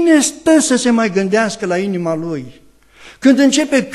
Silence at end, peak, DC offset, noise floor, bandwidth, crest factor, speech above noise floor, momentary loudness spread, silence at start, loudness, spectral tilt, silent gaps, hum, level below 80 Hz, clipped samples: 0 s; 0 dBFS; under 0.1%; -42 dBFS; 13 kHz; 14 dB; 29 dB; 8 LU; 0 s; -14 LUFS; -4 dB/octave; none; none; -54 dBFS; under 0.1%